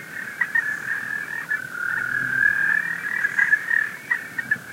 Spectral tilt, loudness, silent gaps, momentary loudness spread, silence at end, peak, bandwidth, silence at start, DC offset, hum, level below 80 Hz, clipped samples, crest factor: -2.5 dB/octave; -22 LUFS; none; 8 LU; 0 s; -6 dBFS; 16 kHz; 0 s; under 0.1%; none; -72 dBFS; under 0.1%; 18 dB